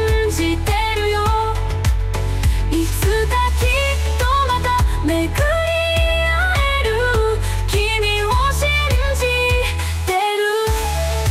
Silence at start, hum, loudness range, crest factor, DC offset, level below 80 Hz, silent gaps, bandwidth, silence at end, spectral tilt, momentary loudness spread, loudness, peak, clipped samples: 0 s; none; 1 LU; 10 dB; under 0.1%; -22 dBFS; none; 16 kHz; 0 s; -4.5 dB/octave; 4 LU; -18 LUFS; -8 dBFS; under 0.1%